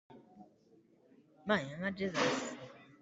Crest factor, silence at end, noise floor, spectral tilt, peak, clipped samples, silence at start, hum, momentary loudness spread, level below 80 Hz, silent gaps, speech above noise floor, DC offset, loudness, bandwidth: 22 dB; 0.15 s; -67 dBFS; -4.5 dB/octave; -18 dBFS; under 0.1%; 0.1 s; none; 18 LU; -76 dBFS; none; 32 dB; under 0.1%; -36 LUFS; 8.2 kHz